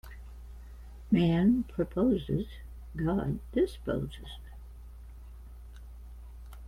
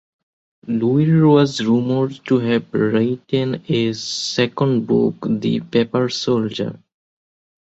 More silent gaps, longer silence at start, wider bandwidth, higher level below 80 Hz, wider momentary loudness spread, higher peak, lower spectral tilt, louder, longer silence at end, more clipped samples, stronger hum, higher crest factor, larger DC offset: neither; second, 0.05 s vs 0.65 s; first, 15.5 kHz vs 8.2 kHz; first, -46 dBFS vs -58 dBFS; first, 24 LU vs 7 LU; second, -14 dBFS vs -2 dBFS; first, -8.5 dB/octave vs -6.5 dB/octave; second, -30 LUFS vs -18 LUFS; second, 0 s vs 1 s; neither; neither; about the same, 18 dB vs 16 dB; neither